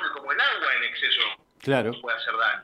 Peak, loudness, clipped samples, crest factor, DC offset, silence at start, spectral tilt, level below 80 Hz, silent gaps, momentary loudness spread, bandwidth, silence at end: -8 dBFS; -24 LUFS; under 0.1%; 18 dB; under 0.1%; 0 s; -4.5 dB/octave; -74 dBFS; none; 6 LU; 14 kHz; 0 s